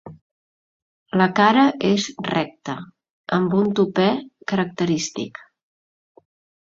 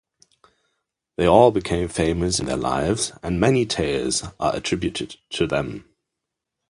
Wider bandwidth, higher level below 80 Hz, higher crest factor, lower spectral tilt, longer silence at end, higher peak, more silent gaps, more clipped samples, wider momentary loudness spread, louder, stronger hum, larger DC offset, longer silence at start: second, 7.8 kHz vs 11.5 kHz; second, -62 dBFS vs -42 dBFS; about the same, 20 dB vs 22 dB; about the same, -5.5 dB/octave vs -4.5 dB/octave; first, 1.35 s vs 0.9 s; about the same, -2 dBFS vs -2 dBFS; first, 0.21-1.06 s, 3.10-3.24 s vs none; neither; first, 16 LU vs 11 LU; about the same, -20 LUFS vs -21 LUFS; neither; neither; second, 0.05 s vs 1.2 s